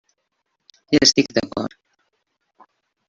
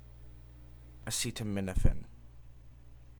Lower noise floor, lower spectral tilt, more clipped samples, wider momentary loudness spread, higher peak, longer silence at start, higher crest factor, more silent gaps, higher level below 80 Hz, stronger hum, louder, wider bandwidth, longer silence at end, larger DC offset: first, -74 dBFS vs -52 dBFS; second, -3 dB/octave vs -4.5 dB/octave; neither; second, 15 LU vs 24 LU; first, -2 dBFS vs -12 dBFS; first, 0.9 s vs 0.1 s; about the same, 22 dB vs 24 dB; neither; second, -54 dBFS vs -38 dBFS; neither; first, -18 LUFS vs -35 LUFS; second, 7.6 kHz vs over 20 kHz; first, 1.4 s vs 0.1 s; neither